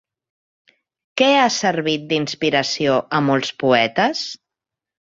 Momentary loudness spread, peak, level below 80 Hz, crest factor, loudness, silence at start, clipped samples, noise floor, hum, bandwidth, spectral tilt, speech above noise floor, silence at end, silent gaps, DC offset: 9 LU; -2 dBFS; -62 dBFS; 18 dB; -18 LUFS; 1.15 s; under 0.1%; -86 dBFS; none; 7.8 kHz; -4 dB/octave; 68 dB; 0.8 s; none; under 0.1%